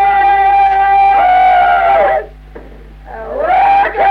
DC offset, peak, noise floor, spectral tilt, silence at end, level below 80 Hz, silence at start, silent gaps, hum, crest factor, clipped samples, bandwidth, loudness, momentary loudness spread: under 0.1%; -2 dBFS; -33 dBFS; -5 dB/octave; 0 s; -34 dBFS; 0 s; none; 50 Hz at -35 dBFS; 8 dB; under 0.1%; 5.2 kHz; -9 LUFS; 10 LU